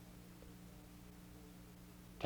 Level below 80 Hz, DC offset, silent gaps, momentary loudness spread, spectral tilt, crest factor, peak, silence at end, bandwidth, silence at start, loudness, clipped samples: -64 dBFS; under 0.1%; none; 1 LU; -5 dB/octave; 30 dB; -24 dBFS; 0 s; over 20 kHz; 0 s; -58 LUFS; under 0.1%